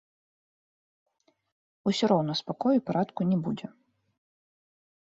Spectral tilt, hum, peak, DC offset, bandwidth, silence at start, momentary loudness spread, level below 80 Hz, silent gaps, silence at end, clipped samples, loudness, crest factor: -6.5 dB/octave; none; -12 dBFS; under 0.1%; 7.8 kHz; 1.85 s; 10 LU; -72 dBFS; none; 1.35 s; under 0.1%; -28 LUFS; 20 dB